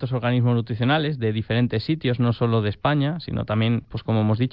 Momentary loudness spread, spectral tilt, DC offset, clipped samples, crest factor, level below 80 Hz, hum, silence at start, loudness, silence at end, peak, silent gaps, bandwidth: 4 LU; -10.5 dB/octave; 0.1%; under 0.1%; 14 dB; -50 dBFS; none; 0 s; -23 LUFS; 0.05 s; -8 dBFS; none; 5.4 kHz